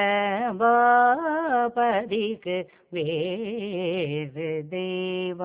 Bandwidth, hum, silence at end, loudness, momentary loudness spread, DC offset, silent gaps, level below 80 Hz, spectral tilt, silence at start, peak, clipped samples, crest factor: 4 kHz; none; 0 s; -25 LUFS; 11 LU; under 0.1%; none; -68 dBFS; -9 dB/octave; 0 s; -8 dBFS; under 0.1%; 16 dB